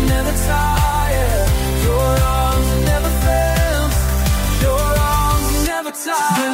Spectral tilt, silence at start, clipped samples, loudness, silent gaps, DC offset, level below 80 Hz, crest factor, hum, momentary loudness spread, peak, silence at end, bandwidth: -5 dB/octave; 0 s; under 0.1%; -17 LUFS; none; under 0.1%; -18 dBFS; 12 dB; none; 2 LU; -4 dBFS; 0 s; 16.5 kHz